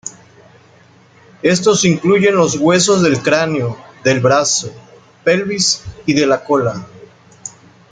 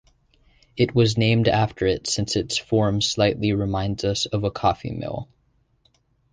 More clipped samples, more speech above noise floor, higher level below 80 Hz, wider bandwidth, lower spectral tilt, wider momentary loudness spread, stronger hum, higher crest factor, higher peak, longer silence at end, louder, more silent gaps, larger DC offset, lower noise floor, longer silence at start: neither; second, 33 dB vs 43 dB; second, -52 dBFS vs -44 dBFS; about the same, 9.6 kHz vs 10 kHz; about the same, -4 dB/octave vs -5 dB/octave; first, 18 LU vs 11 LU; neither; about the same, 14 dB vs 18 dB; first, 0 dBFS vs -6 dBFS; second, 0.45 s vs 1.1 s; first, -14 LUFS vs -22 LUFS; neither; neither; second, -47 dBFS vs -65 dBFS; second, 0.05 s vs 0.75 s